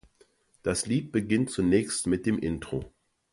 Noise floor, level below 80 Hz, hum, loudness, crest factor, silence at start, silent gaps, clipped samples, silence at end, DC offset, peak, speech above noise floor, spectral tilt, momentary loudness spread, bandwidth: -64 dBFS; -50 dBFS; none; -28 LUFS; 18 dB; 0.65 s; none; under 0.1%; 0.45 s; under 0.1%; -10 dBFS; 37 dB; -5 dB/octave; 11 LU; 11.5 kHz